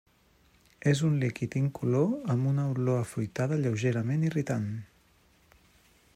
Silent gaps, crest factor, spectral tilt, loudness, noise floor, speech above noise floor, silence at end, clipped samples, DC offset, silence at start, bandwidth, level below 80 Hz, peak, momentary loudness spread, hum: none; 18 dB; -7.5 dB/octave; -29 LUFS; -64 dBFS; 36 dB; 1.3 s; under 0.1%; under 0.1%; 0.85 s; 13 kHz; -66 dBFS; -12 dBFS; 5 LU; none